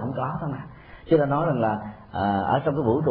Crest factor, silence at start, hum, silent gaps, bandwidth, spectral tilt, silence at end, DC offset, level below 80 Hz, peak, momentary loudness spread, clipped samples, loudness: 16 dB; 0 s; none; none; 4.9 kHz; -12 dB/octave; 0 s; under 0.1%; -52 dBFS; -8 dBFS; 12 LU; under 0.1%; -24 LUFS